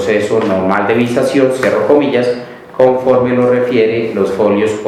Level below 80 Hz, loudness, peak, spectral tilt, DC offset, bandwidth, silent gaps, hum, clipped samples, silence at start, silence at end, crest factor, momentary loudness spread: -52 dBFS; -12 LUFS; 0 dBFS; -6.5 dB/octave; under 0.1%; 13.5 kHz; none; none; 0.1%; 0 s; 0 s; 12 dB; 4 LU